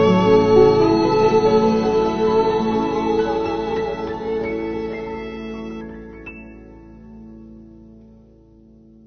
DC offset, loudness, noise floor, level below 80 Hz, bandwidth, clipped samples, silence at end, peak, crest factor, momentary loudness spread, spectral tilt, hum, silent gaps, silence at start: under 0.1%; -18 LUFS; -48 dBFS; -44 dBFS; 6.6 kHz; under 0.1%; 1.1 s; -2 dBFS; 16 dB; 21 LU; -7 dB/octave; none; none; 0 s